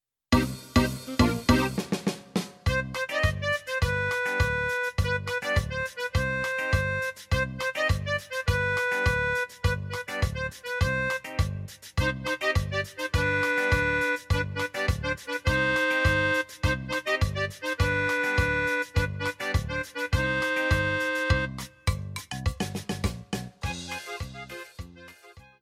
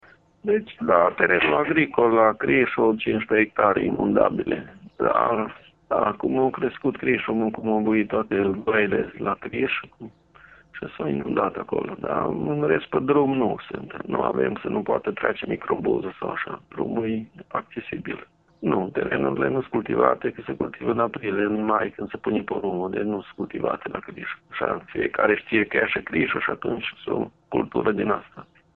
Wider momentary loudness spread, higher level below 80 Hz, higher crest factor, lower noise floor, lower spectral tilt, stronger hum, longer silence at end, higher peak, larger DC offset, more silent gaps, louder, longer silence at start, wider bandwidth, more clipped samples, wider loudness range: second, 9 LU vs 12 LU; first, -38 dBFS vs -56 dBFS; about the same, 20 dB vs 22 dB; about the same, -52 dBFS vs -51 dBFS; second, -5 dB/octave vs -9.5 dB/octave; neither; second, 0.2 s vs 0.35 s; second, -8 dBFS vs -2 dBFS; neither; neither; second, -27 LUFS vs -24 LUFS; second, 0.3 s vs 0.45 s; first, 16 kHz vs 4.2 kHz; neither; second, 3 LU vs 7 LU